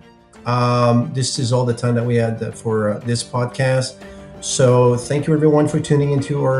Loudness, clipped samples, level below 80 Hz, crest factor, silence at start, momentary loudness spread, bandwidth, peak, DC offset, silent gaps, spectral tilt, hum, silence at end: -18 LUFS; under 0.1%; -50 dBFS; 16 dB; 0.4 s; 8 LU; 11 kHz; -2 dBFS; under 0.1%; none; -6 dB/octave; none; 0 s